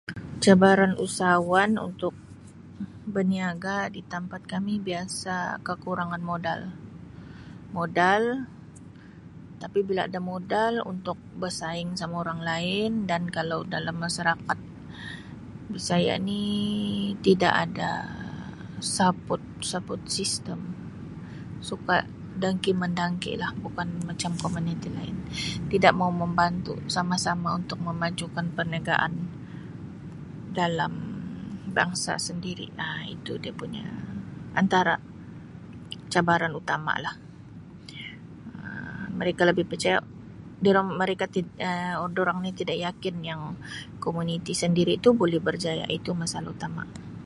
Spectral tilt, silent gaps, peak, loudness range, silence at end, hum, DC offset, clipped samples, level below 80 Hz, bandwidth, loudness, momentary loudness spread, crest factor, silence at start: -5 dB/octave; none; -2 dBFS; 5 LU; 0 s; none; under 0.1%; under 0.1%; -54 dBFS; 11.5 kHz; -27 LUFS; 18 LU; 26 dB; 0.05 s